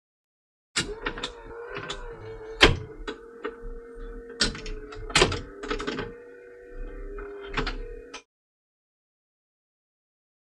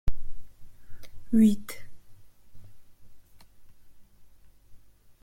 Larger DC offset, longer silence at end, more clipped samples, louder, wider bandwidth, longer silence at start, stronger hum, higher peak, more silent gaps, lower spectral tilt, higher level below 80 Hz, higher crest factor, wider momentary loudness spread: neither; first, 2.25 s vs 0.45 s; neither; about the same, -27 LUFS vs -25 LUFS; second, 12.5 kHz vs 16.5 kHz; first, 0.75 s vs 0.05 s; neither; first, -2 dBFS vs -12 dBFS; neither; second, -3 dB/octave vs -7 dB/octave; about the same, -40 dBFS vs -42 dBFS; first, 30 dB vs 18 dB; second, 22 LU vs 27 LU